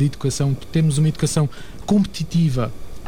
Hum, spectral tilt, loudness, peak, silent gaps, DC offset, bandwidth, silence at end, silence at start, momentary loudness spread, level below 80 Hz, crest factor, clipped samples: none; -6.5 dB/octave; -20 LUFS; -8 dBFS; none; 2%; 15.5 kHz; 0 s; 0 s; 7 LU; -38 dBFS; 12 dB; under 0.1%